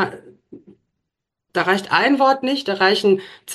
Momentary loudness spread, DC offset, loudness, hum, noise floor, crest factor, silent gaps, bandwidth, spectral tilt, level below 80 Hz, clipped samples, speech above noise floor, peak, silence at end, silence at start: 7 LU; under 0.1%; -18 LUFS; none; -80 dBFS; 18 dB; none; 12.5 kHz; -4 dB/octave; -68 dBFS; under 0.1%; 63 dB; -2 dBFS; 0 s; 0 s